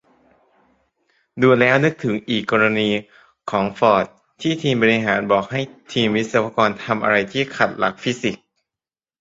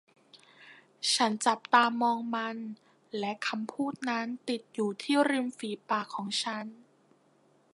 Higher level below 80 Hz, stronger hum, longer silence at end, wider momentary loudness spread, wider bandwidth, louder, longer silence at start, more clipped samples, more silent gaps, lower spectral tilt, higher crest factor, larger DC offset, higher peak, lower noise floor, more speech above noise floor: first, -58 dBFS vs -84 dBFS; neither; second, 0.85 s vs 1 s; second, 10 LU vs 14 LU; second, 7.8 kHz vs 11.5 kHz; first, -19 LUFS vs -30 LUFS; first, 1.35 s vs 0.35 s; neither; neither; first, -5.5 dB/octave vs -3 dB/octave; second, 18 dB vs 24 dB; neither; first, -2 dBFS vs -8 dBFS; first, under -90 dBFS vs -66 dBFS; first, over 71 dB vs 36 dB